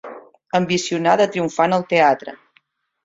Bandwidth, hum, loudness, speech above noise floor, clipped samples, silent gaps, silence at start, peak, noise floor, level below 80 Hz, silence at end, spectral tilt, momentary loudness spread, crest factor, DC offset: 7.8 kHz; none; -18 LUFS; 44 dB; under 0.1%; none; 0.05 s; -2 dBFS; -61 dBFS; -62 dBFS; 0.7 s; -4.5 dB/octave; 9 LU; 18 dB; under 0.1%